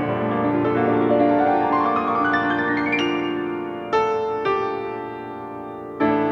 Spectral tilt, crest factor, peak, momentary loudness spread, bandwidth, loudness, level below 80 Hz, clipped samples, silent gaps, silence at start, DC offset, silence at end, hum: -7 dB/octave; 14 dB; -6 dBFS; 14 LU; 6.6 kHz; -21 LUFS; -58 dBFS; under 0.1%; none; 0 s; under 0.1%; 0 s; none